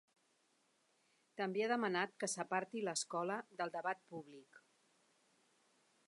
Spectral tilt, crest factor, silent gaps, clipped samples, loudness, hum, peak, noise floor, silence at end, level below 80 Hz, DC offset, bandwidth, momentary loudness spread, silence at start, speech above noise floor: -3 dB/octave; 20 dB; none; under 0.1%; -41 LUFS; none; -24 dBFS; -78 dBFS; 1.5 s; under -90 dBFS; under 0.1%; 11.5 kHz; 16 LU; 1.35 s; 37 dB